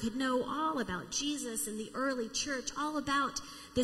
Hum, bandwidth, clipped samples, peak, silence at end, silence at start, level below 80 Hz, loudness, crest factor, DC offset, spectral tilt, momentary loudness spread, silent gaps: none; 15.5 kHz; under 0.1%; -20 dBFS; 0 s; 0 s; -60 dBFS; -35 LUFS; 16 dB; under 0.1%; -2.5 dB/octave; 4 LU; none